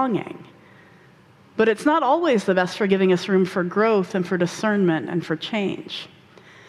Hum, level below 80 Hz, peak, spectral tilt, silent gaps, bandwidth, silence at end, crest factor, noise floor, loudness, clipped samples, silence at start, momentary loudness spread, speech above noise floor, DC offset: none; -66 dBFS; -6 dBFS; -6 dB/octave; none; 12.5 kHz; 0.6 s; 16 dB; -51 dBFS; -21 LUFS; under 0.1%; 0 s; 14 LU; 31 dB; under 0.1%